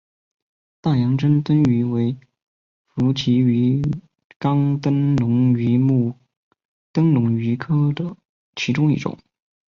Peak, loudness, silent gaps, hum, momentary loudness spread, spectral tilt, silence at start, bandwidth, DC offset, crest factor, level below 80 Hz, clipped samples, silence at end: -6 dBFS; -19 LUFS; 2.42-2.85 s, 4.24-4.30 s, 4.36-4.40 s, 6.37-6.51 s, 6.65-6.94 s, 8.25-8.53 s; none; 9 LU; -8 dB/octave; 0.85 s; 7.2 kHz; under 0.1%; 14 dB; -52 dBFS; under 0.1%; 0.6 s